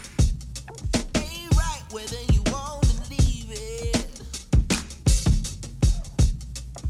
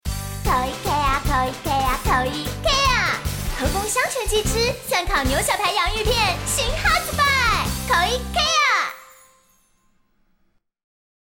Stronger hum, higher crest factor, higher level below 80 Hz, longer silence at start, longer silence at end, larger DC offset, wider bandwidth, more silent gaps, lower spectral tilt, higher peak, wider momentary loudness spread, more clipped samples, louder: neither; about the same, 16 dB vs 14 dB; about the same, -26 dBFS vs -30 dBFS; about the same, 0 s vs 0.05 s; second, 0 s vs 2.15 s; neither; second, 14 kHz vs 17 kHz; neither; first, -5 dB/octave vs -3 dB/octave; about the same, -8 dBFS vs -8 dBFS; first, 11 LU vs 7 LU; neither; second, -26 LUFS vs -20 LUFS